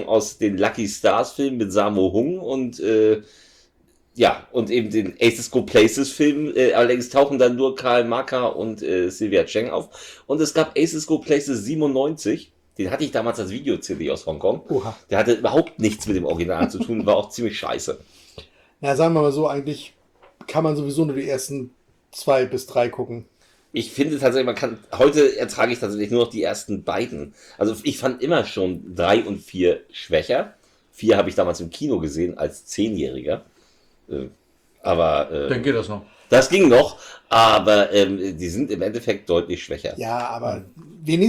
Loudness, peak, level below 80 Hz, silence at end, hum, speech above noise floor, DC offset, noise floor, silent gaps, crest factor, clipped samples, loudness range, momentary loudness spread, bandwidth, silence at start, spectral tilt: -21 LUFS; -4 dBFS; -52 dBFS; 0 s; none; 39 dB; under 0.1%; -60 dBFS; none; 16 dB; under 0.1%; 7 LU; 12 LU; 16 kHz; 0 s; -5 dB/octave